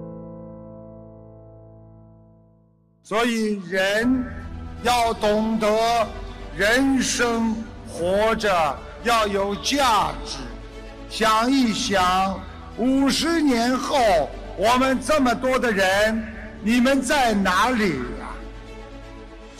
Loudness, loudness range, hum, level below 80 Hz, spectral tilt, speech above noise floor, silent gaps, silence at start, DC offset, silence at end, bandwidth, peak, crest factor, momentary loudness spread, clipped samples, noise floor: -21 LUFS; 5 LU; none; -40 dBFS; -4 dB/octave; 38 dB; none; 0 s; under 0.1%; 0 s; 15.5 kHz; -10 dBFS; 12 dB; 19 LU; under 0.1%; -58 dBFS